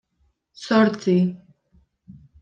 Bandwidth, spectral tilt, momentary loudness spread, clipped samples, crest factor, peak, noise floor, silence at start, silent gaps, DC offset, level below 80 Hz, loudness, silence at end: 8.4 kHz; -7 dB/octave; 20 LU; under 0.1%; 18 dB; -6 dBFS; -68 dBFS; 0.6 s; none; under 0.1%; -64 dBFS; -20 LUFS; 0.3 s